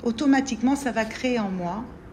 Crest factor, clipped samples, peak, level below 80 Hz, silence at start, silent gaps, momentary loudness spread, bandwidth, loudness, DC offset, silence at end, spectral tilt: 16 dB; under 0.1%; -10 dBFS; -50 dBFS; 0 s; none; 9 LU; 13.5 kHz; -24 LUFS; under 0.1%; 0 s; -5 dB/octave